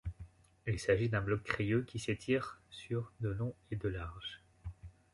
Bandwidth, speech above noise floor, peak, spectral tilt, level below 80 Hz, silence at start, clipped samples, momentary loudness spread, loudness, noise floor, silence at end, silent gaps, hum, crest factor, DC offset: 11.5 kHz; 19 dB; -16 dBFS; -6.5 dB/octave; -54 dBFS; 0.05 s; under 0.1%; 18 LU; -37 LUFS; -56 dBFS; 0.25 s; none; none; 22 dB; under 0.1%